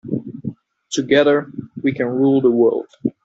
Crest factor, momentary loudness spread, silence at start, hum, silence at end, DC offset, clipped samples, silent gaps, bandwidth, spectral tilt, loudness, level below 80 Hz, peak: 16 dB; 17 LU; 0.05 s; none; 0.15 s; under 0.1%; under 0.1%; none; 8 kHz; -5 dB/octave; -18 LUFS; -60 dBFS; -2 dBFS